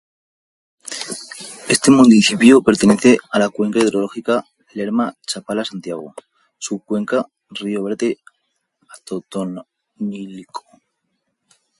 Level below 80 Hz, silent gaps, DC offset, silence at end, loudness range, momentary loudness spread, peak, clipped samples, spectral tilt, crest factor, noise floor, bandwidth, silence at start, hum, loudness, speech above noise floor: -58 dBFS; none; under 0.1%; 1.2 s; 14 LU; 21 LU; 0 dBFS; under 0.1%; -4.5 dB/octave; 18 dB; -72 dBFS; 11.5 kHz; 0.9 s; none; -16 LUFS; 56 dB